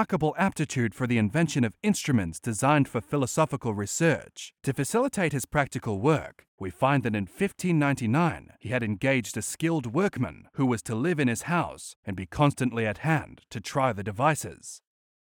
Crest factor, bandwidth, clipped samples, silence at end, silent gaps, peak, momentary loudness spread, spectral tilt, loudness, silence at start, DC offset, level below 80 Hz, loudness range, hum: 18 dB; 19 kHz; under 0.1%; 0.55 s; 6.48-6.58 s, 11.96-12.03 s; -8 dBFS; 10 LU; -5.5 dB/octave; -27 LUFS; 0 s; under 0.1%; -56 dBFS; 2 LU; none